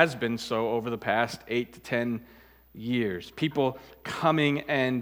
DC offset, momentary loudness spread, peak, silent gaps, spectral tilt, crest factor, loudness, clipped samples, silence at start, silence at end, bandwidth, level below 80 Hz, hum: under 0.1%; 8 LU; -4 dBFS; none; -6 dB/octave; 24 dB; -28 LUFS; under 0.1%; 0 s; 0 s; 17 kHz; -62 dBFS; none